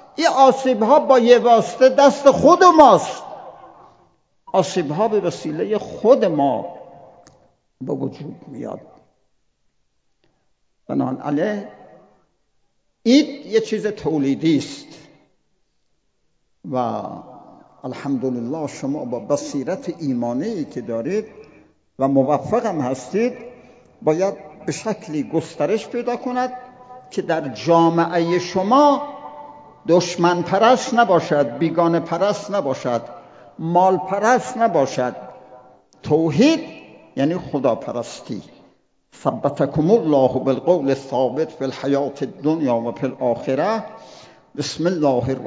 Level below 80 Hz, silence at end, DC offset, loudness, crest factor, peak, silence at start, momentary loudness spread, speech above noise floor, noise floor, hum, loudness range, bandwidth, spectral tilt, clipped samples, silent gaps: -58 dBFS; 0 s; under 0.1%; -19 LUFS; 20 dB; 0 dBFS; 0.2 s; 18 LU; 52 dB; -70 dBFS; none; 12 LU; 8 kHz; -6 dB/octave; under 0.1%; none